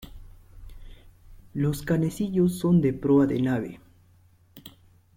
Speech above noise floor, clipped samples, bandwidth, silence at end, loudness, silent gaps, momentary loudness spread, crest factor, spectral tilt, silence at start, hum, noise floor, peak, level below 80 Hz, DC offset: 35 dB; under 0.1%; 16.5 kHz; 0.5 s; -24 LUFS; none; 20 LU; 16 dB; -8 dB/octave; 0 s; none; -58 dBFS; -10 dBFS; -48 dBFS; under 0.1%